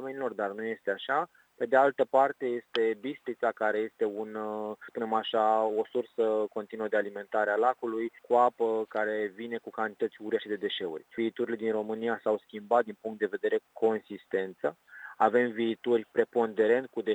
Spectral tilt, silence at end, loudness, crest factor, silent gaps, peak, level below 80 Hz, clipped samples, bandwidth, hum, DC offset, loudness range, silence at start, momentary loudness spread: -6 dB/octave; 0 s; -30 LUFS; 20 dB; none; -8 dBFS; -84 dBFS; under 0.1%; 19 kHz; none; under 0.1%; 3 LU; 0 s; 10 LU